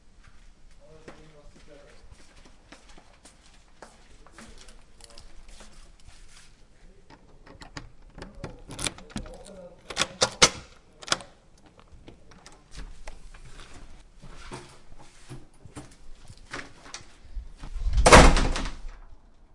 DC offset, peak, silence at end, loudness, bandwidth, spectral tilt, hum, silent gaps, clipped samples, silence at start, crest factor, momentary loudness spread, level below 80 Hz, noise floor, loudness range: under 0.1%; 0 dBFS; 0.6 s; -21 LUFS; 11.5 kHz; -3 dB/octave; none; none; under 0.1%; 1.1 s; 28 dB; 29 LU; -34 dBFS; -54 dBFS; 26 LU